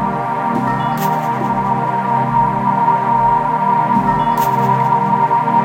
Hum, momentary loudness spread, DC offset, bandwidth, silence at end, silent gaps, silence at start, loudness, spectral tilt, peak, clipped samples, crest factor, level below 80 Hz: none; 4 LU; under 0.1%; 16.5 kHz; 0 s; none; 0 s; -15 LUFS; -7 dB/octave; -2 dBFS; under 0.1%; 12 dB; -44 dBFS